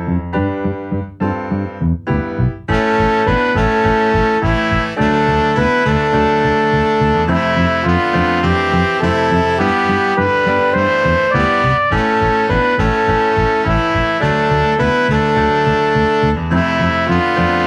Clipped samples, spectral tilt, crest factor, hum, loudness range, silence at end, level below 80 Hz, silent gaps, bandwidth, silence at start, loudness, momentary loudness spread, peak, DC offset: under 0.1%; -7 dB/octave; 14 dB; none; 1 LU; 0 s; -28 dBFS; none; 11 kHz; 0 s; -15 LUFS; 5 LU; 0 dBFS; under 0.1%